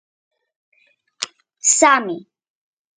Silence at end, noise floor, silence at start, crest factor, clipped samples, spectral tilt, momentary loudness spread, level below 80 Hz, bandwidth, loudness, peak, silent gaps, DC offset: 0.75 s; -58 dBFS; 1.2 s; 22 dB; under 0.1%; -0.5 dB/octave; 17 LU; -68 dBFS; 9.8 kHz; -15 LUFS; 0 dBFS; none; under 0.1%